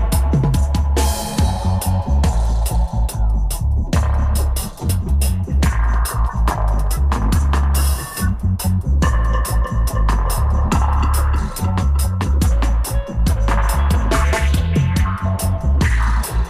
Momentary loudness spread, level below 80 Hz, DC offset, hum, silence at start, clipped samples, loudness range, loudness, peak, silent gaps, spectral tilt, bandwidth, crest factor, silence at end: 3 LU; -18 dBFS; 0.2%; none; 0 s; under 0.1%; 1 LU; -18 LUFS; -6 dBFS; none; -5.5 dB/octave; 16 kHz; 10 dB; 0 s